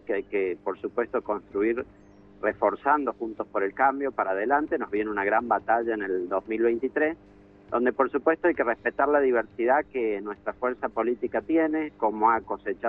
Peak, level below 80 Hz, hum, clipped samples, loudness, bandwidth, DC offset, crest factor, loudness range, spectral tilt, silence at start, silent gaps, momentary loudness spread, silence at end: -8 dBFS; -60 dBFS; 50 Hz at -60 dBFS; under 0.1%; -26 LUFS; 4 kHz; under 0.1%; 18 dB; 2 LU; -8.5 dB/octave; 0.05 s; none; 7 LU; 0 s